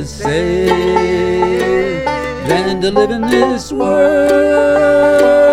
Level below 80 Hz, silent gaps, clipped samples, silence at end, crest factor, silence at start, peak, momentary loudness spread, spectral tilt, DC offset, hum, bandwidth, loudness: -34 dBFS; none; under 0.1%; 0 s; 12 dB; 0 s; 0 dBFS; 7 LU; -5.5 dB/octave; under 0.1%; none; 13.5 kHz; -12 LUFS